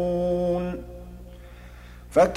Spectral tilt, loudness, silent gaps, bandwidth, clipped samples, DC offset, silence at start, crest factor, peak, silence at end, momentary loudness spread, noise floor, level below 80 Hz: -7 dB/octave; -26 LUFS; none; 15 kHz; under 0.1%; under 0.1%; 0 s; 18 dB; -8 dBFS; 0 s; 21 LU; -43 dBFS; -42 dBFS